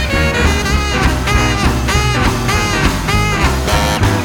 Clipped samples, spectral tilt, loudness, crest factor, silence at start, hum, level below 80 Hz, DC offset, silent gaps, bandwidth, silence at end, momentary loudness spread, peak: under 0.1%; -4.5 dB/octave; -14 LUFS; 12 dB; 0 s; none; -18 dBFS; under 0.1%; none; 18.5 kHz; 0 s; 2 LU; 0 dBFS